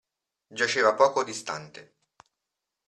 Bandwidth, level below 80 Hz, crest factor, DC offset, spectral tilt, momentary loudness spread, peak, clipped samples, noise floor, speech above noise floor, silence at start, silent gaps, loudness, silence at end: 11.5 kHz; -76 dBFS; 22 dB; under 0.1%; -2.5 dB/octave; 19 LU; -6 dBFS; under 0.1%; -85 dBFS; 60 dB; 0.5 s; none; -25 LUFS; 1.05 s